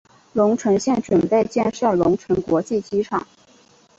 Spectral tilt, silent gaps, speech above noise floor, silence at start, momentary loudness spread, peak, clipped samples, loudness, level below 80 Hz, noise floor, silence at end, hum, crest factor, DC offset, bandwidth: -6.5 dB/octave; none; 34 dB; 0.35 s; 5 LU; -4 dBFS; under 0.1%; -20 LUFS; -52 dBFS; -53 dBFS; 0.8 s; none; 16 dB; under 0.1%; 8 kHz